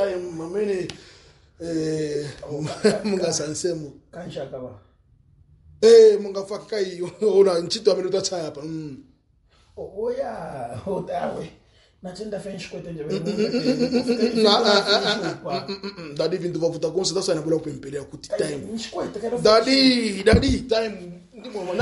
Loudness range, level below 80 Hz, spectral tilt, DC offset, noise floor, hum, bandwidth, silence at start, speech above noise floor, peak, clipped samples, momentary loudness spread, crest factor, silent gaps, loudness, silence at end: 12 LU; -44 dBFS; -4.5 dB/octave; under 0.1%; -60 dBFS; none; 11.5 kHz; 0 s; 38 dB; -4 dBFS; under 0.1%; 17 LU; 18 dB; none; -22 LUFS; 0 s